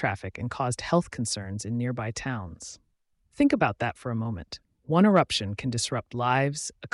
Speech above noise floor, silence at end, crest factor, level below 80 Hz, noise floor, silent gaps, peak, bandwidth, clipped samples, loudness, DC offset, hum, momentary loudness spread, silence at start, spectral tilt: 43 dB; 0.05 s; 20 dB; -56 dBFS; -70 dBFS; none; -8 dBFS; 11.5 kHz; under 0.1%; -27 LUFS; under 0.1%; none; 13 LU; 0 s; -5 dB/octave